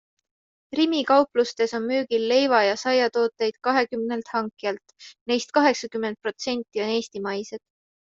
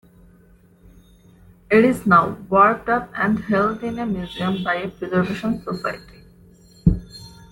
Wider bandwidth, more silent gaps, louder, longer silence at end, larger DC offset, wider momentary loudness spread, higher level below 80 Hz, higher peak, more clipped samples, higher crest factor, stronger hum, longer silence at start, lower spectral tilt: second, 7.8 kHz vs 16.5 kHz; first, 5.21-5.26 s vs none; second, -24 LUFS vs -20 LUFS; first, 0.55 s vs 0.2 s; neither; about the same, 11 LU vs 12 LU; second, -70 dBFS vs -40 dBFS; second, -6 dBFS vs -2 dBFS; neither; about the same, 20 dB vs 20 dB; neither; second, 0.7 s vs 1.7 s; second, -3.5 dB/octave vs -7.5 dB/octave